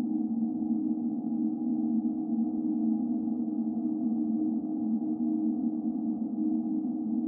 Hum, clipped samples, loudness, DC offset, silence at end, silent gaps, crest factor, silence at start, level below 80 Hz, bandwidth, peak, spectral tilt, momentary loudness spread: none; under 0.1%; -30 LUFS; under 0.1%; 0 s; none; 12 dB; 0 s; -74 dBFS; 1.4 kHz; -18 dBFS; -14 dB/octave; 2 LU